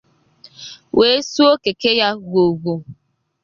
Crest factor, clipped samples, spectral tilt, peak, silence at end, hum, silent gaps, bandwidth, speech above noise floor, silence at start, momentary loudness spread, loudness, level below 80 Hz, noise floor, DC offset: 16 dB; under 0.1%; -4.5 dB/octave; -2 dBFS; 0.5 s; none; none; 7.4 kHz; 33 dB; 0.6 s; 18 LU; -16 LUFS; -56 dBFS; -49 dBFS; under 0.1%